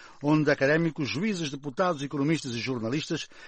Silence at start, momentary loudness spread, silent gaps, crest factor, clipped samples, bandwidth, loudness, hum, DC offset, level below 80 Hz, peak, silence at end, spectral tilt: 0 s; 8 LU; none; 16 dB; under 0.1%; 8.8 kHz; -27 LUFS; none; under 0.1%; -62 dBFS; -12 dBFS; 0 s; -5.5 dB/octave